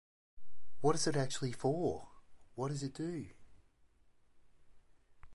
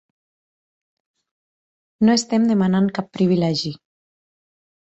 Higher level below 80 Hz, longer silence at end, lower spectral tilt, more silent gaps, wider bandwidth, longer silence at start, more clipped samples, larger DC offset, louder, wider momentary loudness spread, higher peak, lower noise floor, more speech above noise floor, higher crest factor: second, -66 dBFS vs -60 dBFS; second, 0 s vs 1.1 s; about the same, -5 dB/octave vs -6 dB/octave; neither; first, 11.5 kHz vs 8.2 kHz; second, 0.35 s vs 2 s; neither; neither; second, -37 LUFS vs -19 LUFS; first, 13 LU vs 6 LU; second, -18 dBFS vs -6 dBFS; second, -67 dBFS vs under -90 dBFS; second, 31 dB vs over 72 dB; about the same, 20 dB vs 16 dB